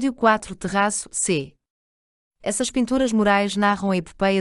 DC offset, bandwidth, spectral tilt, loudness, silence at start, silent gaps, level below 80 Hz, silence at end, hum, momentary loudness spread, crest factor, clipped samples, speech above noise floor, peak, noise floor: under 0.1%; 11.5 kHz; -4 dB/octave; -21 LUFS; 0 s; 1.70-2.31 s; -50 dBFS; 0 s; none; 7 LU; 18 dB; under 0.1%; over 69 dB; -4 dBFS; under -90 dBFS